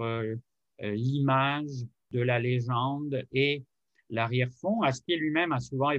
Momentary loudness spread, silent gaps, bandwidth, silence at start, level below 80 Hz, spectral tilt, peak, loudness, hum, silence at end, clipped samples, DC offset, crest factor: 10 LU; none; 8.2 kHz; 0 s; -68 dBFS; -6.5 dB/octave; -12 dBFS; -29 LUFS; none; 0 s; under 0.1%; under 0.1%; 18 dB